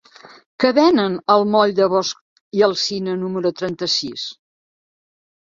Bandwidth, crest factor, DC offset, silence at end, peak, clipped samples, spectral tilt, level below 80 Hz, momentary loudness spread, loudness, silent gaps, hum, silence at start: 7.6 kHz; 18 dB; under 0.1%; 1.25 s; -2 dBFS; under 0.1%; -4.5 dB/octave; -62 dBFS; 12 LU; -18 LUFS; 2.21-2.51 s; none; 0.6 s